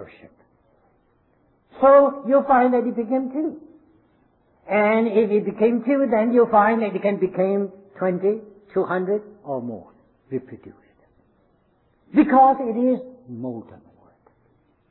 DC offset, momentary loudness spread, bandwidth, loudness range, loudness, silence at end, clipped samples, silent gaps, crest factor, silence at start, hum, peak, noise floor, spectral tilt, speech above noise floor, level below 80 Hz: under 0.1%; 17 LU; 4.2 kHz; 8 LU; -20 LUFS; 1.15 s; under 0.1%; none; 18 dB; 0 s; none; -4 dBFS; -63 dBFS; -11.5 dB/octave; 43 dB; -62 dBFS